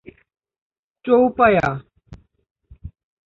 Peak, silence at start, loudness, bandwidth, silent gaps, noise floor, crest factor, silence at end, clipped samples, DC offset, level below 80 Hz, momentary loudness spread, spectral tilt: -2 dBFS; 1.05 s; -17 LUFS; 7 kHz; 2.51-2.55 s; -45 dBFS; 20 dB; 0.4 s; under 0.1%; under 0.1%; -48 dBFS; 19 LU; -8 dB/octave